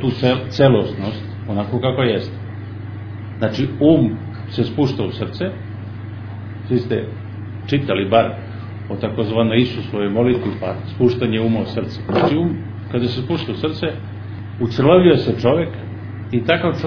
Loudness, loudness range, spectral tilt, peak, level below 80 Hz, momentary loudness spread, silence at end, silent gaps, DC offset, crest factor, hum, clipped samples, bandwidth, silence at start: -18 LUFS; 4 LU; -8.5 dB/octave; 0 dBFS; -46 dBFS; 16 LU; 0 s; none; under 0.1%; 18 dB; none; under 0.1%; 5.4 kHz; 0 s